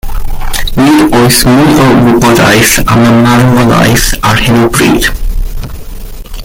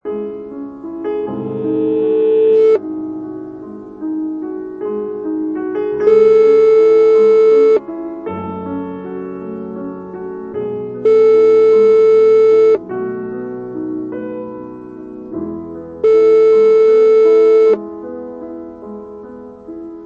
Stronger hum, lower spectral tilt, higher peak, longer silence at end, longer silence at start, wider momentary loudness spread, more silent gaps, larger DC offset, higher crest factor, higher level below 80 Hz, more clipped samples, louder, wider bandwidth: neither; second, -4.5 dB/octave vs -8 dB/octave; about the same, 0 dBFS vs -2 dBFS; about the same, 0 s vs 0 s; about the same, 0.05 s vs 0.05 s; second, 16 LU vs 20 LU; neither; neither; second, 6 dB vs 12 dB; first, -16 dBFS vs -56 dBFS; first, 0.5% vs under 0.1%; first, -6 LUFS vs -12 LUFS; first, over 20 kHz vs 5.2 kHz